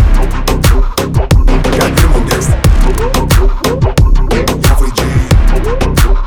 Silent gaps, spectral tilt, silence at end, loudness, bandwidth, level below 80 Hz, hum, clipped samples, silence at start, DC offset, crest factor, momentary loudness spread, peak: none; -5.5 dB/octave; 0 s; -11 LUFS; 19.5 kHz; -10 dBFS; none; under 0.1%; 0 s; 0.4%; 8 dB; 3 LU; 0 dBFS